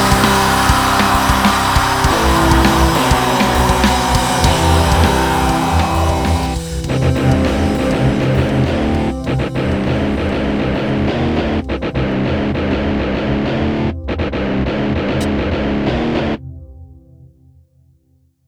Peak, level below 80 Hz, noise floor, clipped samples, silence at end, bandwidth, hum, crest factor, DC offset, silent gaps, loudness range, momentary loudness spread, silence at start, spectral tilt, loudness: 0 dBFS; -24 dBFS; -56 dBFS; under 0.1%; 1.2 s; over 20 kHz; none; 14 dB; under 0.1%; none; 6 LU; 7 LU; 0 s; -5 dB/octave; -15 LUFS